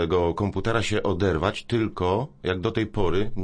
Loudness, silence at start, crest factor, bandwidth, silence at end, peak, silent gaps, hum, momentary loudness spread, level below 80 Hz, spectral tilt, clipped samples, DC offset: -25 LUFS; 0 s; 18 dB; 10.5 kHz; 0 s; -6 dBFS; none; none; 3 LU; -40 dBFS; -6.5 dB/octave; under 0.1%; under 0.1%